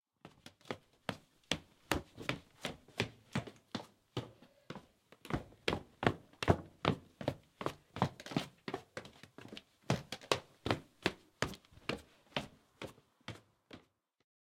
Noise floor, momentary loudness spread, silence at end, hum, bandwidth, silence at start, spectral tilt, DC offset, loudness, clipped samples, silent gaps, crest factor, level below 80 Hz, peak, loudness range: -66 dBFS; 18 LU; 0.7 s; none; 16.5 kHz; 0.25 s; -5 dB/octave; under 0.1%; -41 LUFS; under 0.1%; none; 34 dB; -62 dBFS; -8 dBFS; 6 LU